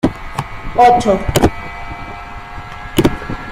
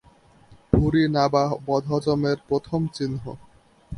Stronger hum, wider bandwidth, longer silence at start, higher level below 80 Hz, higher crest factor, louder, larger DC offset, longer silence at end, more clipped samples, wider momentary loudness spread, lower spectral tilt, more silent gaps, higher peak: neither; first, 16 kHz vs 11 kHz; second, 0.05 s vs 0.5 s; first, -28 dBFS vs -40 dBFS; second, 16 dB vs 24 dB; first, -15 LUFS vs -23 LUFS; neither; about the same, 0 s vs 0 s; neither; first, 20 LU vs 10 LU; second, -5.5 dB/octave vs -7.5 dB/octave; neither; about the same, 0 dBFS vs 0 dBFS